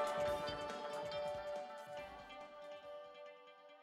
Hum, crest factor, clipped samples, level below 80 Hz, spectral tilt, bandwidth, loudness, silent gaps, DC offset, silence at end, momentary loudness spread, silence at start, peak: none; 16 dB; under 0.1%; -70 dBFS; -4 dB/octave; 16 kHz; -46 LUFS; none; under 0.1%; 0 s; 16 LU; 0 s; -28 dBFS